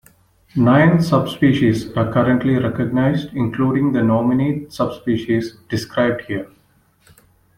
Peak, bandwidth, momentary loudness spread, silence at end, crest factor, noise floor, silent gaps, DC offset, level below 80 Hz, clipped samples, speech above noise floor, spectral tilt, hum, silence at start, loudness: -2 dBFS; 15.5 kHz; 11 LU; 1.1 s; 16 dB; -57 dBFS; none; under 0.1%; -48 dBFS; under 0.1%; 40 dB; -7.5 dB/octave; none; 0.55 s; -18 LUFS